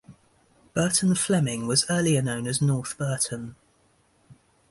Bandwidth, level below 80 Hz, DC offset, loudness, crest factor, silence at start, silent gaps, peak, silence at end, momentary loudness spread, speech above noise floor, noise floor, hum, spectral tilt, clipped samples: 12 kHz; -58 dBFS; under 0.1%; -24 LUFS; 18 dB; 0.1 s; none; -8 dBFS; 0.4 s; 8 LU; 40 dB; -64 dBFS; none; -4.5 dB/octave; under 0.1%